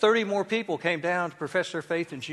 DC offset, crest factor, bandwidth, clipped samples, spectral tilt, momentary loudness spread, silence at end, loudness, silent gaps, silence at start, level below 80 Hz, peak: under 0.1%; 20 dB; 12 kHz; under 0.1%; -4.5 dB/octave; 5 LU; 0 s; -28 LUFS; none; 0 s; -74 dBFS; -8 dBFS